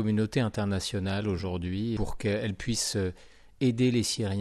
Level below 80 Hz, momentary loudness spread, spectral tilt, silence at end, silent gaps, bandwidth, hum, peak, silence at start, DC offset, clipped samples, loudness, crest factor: -48 dBFS; 6 LU; -5 dB/octave; 0 s; none; 13.5 kHz; none; -14 dBFS; 0 s; under 0.1%; under 0.1%; -29 LUFS; 14 dB